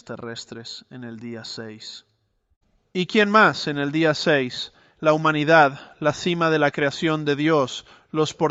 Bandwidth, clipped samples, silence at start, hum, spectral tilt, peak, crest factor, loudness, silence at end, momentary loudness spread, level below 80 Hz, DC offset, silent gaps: 8.2 kHz; under 0.1%; 0.1 s; none; -5 dB/octave; -2 dBFS; 20 dB; -20 LUFS; 0 s; 19 LU; -62 dBFS; under 0.1%; 2.56-2.61 s